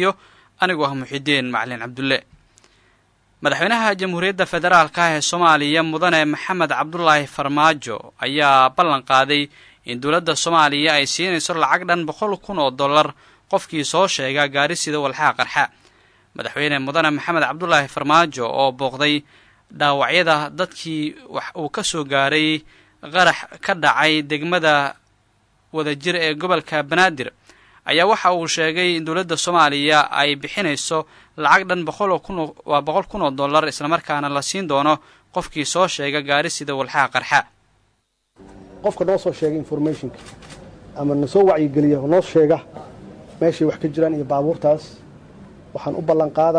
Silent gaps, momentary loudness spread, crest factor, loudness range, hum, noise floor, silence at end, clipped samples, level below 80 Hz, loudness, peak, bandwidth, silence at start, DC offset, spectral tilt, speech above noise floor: none; 10 LU; 18 dB; 5 LU; none; -67 dBFS; 0 s; under 0.1%; -56 dBFS; -18 LUFS; -2 dBFS; 11 kHz; 0 s; under 0.1%; -3.5 dB/octave; 48 dB